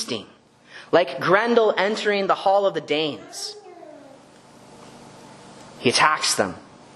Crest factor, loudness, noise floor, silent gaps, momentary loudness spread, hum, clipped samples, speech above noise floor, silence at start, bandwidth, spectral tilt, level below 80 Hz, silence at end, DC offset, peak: 22 dB; -21 LUFS; -48 dBFS; none; 15 LU; none; under 0.1%; 28 dB; 0 s; 12.5 kHz; -3 dB/octave; -68 dBFS; 0.35 s; under 0.1%; -2 dBFS